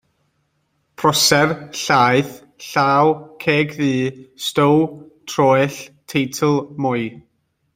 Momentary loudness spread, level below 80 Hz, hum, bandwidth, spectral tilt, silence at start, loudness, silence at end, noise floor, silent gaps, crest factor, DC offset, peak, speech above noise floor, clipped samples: 12 LU; -58 dBFS; none; 16.5 kHz; -4.5 dB/octave; 1 s; -17 LUFS; 0.55 s; -67 dBFS; none; 18 dB; under 0.1%; -2 dBFS; 50 dB; under 0.1%